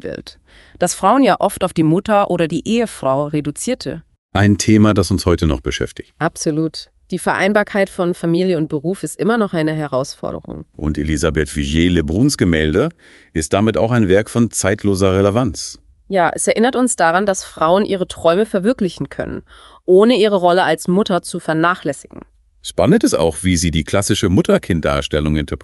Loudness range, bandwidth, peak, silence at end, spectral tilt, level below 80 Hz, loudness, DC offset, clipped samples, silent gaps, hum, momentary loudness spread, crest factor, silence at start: 3 LU; 12 kHz; 0 dBFS; 0.05 s; -5.5 dB/octave; -34 dBFS; -16 LUFS; under 0.1%; under 0.1%; 4.18-4.29 s; none; 12 LU; 16 dB; 0.05 s